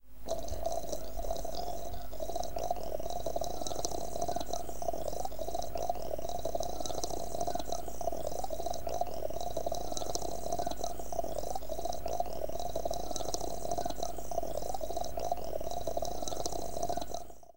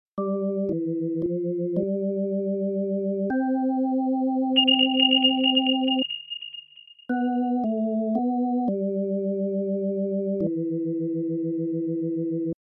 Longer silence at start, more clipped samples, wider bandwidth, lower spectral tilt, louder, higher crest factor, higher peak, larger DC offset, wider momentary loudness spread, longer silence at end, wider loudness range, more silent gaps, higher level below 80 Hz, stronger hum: second, 0 s vs 0.15 s; neither; first, 17 kHz vs 3.6 kHz; second, -4 dB/octave vs -9.5 dB/octave; second, -38 LUFS vs -24 LUFS; first, 22 dB vs 16 dB; second, -14 dBFS vs -8 dBFS; first, 2% vs under 0.1%; second, 3 LU vs 9 LU; about the same, 0 s vs 0.1 s; second, 1 LU vs 6 LU; neither; first, -48 dBFS vs -68 dBFS; neither